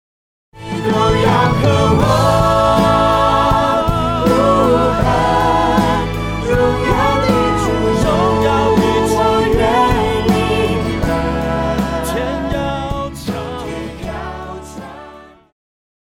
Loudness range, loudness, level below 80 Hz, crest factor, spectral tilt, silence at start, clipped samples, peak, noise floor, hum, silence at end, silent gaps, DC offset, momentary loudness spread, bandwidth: 9 LU; -14 LUFS; -28 dBFS; 14 dB; -6 dB/octave; 0.55 s; under 0.1%; 0 dBFS; -38 dBFS; none; 0.85 s; none; under 0.1%; 13 LU; 17 kHz